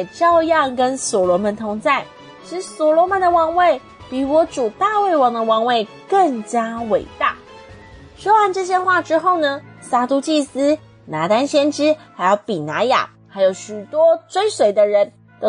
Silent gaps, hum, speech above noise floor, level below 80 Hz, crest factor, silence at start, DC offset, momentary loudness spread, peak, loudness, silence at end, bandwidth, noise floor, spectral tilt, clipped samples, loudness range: none; none; 24 dB; -56 dBFS; 14 dB; 0 s; under 0.1%; 9 LU; -4 dBFS; -17 LUFS; 0 s; 10 kHz; -40 dBFS; -4 dB/octave; under 0.1%; 2 LU